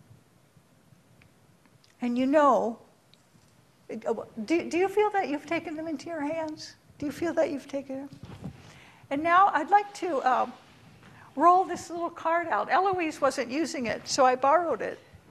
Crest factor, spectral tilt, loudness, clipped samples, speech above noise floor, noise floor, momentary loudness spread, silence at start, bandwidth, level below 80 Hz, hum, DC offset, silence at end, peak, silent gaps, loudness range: 20 dB; -4 dB/octave; -27 LUFS; under 0.1%; 34 dB; -61 dBFS; 18 LU; 2 s; 13.5 kHz; -68 dBFS; none; under 0.1%; 0.35 s; -8 dBFS; none; 6 LU